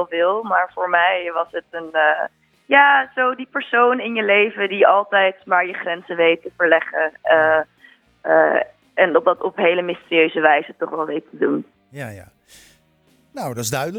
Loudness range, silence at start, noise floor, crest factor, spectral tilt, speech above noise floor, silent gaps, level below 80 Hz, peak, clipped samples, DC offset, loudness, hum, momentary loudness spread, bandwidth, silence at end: 5 LU; 0 s; -58 dBFS; 18 dB; -4 dB/octave; 40 dB; none; -66 dBFS; 0 dBFS; under 0.1%; under 0.1%; -18 LUFS; none; 12 LU; 16 kHz; 0 s